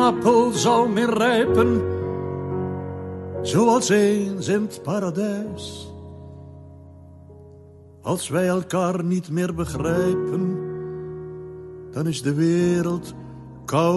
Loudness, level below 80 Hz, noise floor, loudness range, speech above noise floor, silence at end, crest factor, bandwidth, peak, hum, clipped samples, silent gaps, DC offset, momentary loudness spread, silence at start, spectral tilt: -22 LUFS; -54 dBFS; -46 dBFS; 8 LU; 25 dB; 0 s; 16 dB; 12.5 kHz; -6 dBFS; none; under 0.1%; none; under 0.1%; 19 LU; 0 s; -5.5 dB/octave